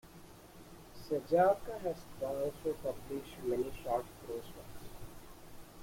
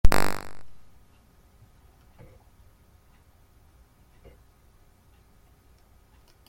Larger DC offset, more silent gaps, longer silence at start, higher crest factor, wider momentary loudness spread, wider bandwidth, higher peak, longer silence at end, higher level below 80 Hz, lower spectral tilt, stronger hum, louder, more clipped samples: neither; neither; about the same, 0.05 s vs 0.05 s; about the same, 22 dB vs 24 dB; first, 25 LU vs 22 LU; about the same, 16.5 kHz vs 16.5 kHz; second, -16 dBFS vs -2 dBFS; second, 0 s vs 5.75 s; second, -58 dBFS vs -36 dBFS; first, -6 dB/octave vs -4.5 dB/octave; neither; second, -36 LUFS vs -30 LUFS; neither